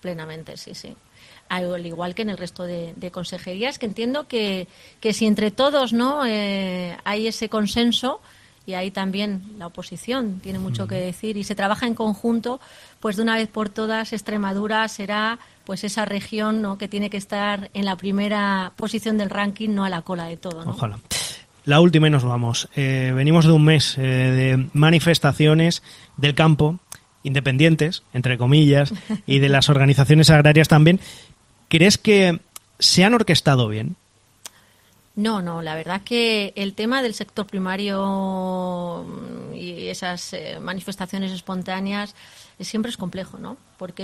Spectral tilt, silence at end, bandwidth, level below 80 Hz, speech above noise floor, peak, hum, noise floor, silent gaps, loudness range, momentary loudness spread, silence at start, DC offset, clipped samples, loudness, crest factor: -5.5 dB/octave; 0 s; 14 kHz; -52 dBFS; 36 dB; -2 dBFS; none; -56 dBFS; none; 13 LU; 17 LU; 0.05 s; under 0.1%; under 0.1%; -20 LUFS; 20 dB